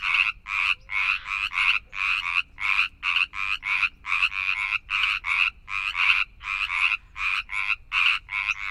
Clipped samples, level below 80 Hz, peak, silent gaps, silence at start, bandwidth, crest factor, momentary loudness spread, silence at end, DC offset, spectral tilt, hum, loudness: under 0.1%; -50 dBFS; -4 dBFS; none; 0 s; 15 kHz; 22 dB; 5 LU; 0 s; under 0.1%; 1 dB/octave; none; -23 LUFS